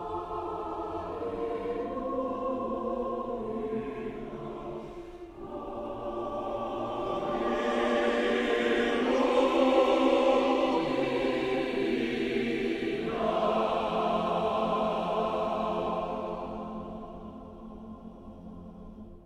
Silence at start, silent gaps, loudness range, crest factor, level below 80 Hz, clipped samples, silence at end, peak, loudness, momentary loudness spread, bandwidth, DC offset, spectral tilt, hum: 0 s; none; 11 LU; 18 dB; -54 dBFS; under 0.1%; 0 s; -12 dBFS; -30 LUFS; 19 LU; 12 kHz; under 0.1%; -6 dB/octave; none